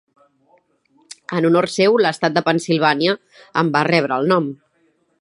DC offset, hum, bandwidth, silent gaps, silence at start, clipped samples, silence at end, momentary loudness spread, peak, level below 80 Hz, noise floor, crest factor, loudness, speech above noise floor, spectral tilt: under 0.1%; none; 11.5 kHz; none; 1.3 s; under 0.1%; 0.65 s; 10 LU; 0 dBFS; -68 dBFS; -62 dBFS; 18 dB; -17 LUFS; 45 dB; -5.5 dB/octave